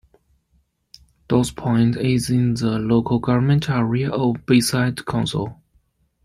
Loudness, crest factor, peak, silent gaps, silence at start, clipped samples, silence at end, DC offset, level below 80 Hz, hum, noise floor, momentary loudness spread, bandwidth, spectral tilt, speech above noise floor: -20 LUFS; 16 dB; -4 dBFS; none; 1.3 s; under 0.1%; 0.7 s; under 0.1%; -48 dBFS; none; -64 dBFS; 5 LU; 16 kHz; -6 dB/octave; 46 dB